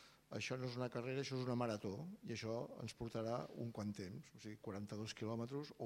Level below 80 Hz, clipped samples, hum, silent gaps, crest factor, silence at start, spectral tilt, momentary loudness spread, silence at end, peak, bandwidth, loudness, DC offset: -76 dBFS; under 0.1%; none; none; 20 dB; 0 s; -6 dB/octave; 8 LU; 0 s; -26 dBFS; 16 kHz; -46 LUFS; under 0.1%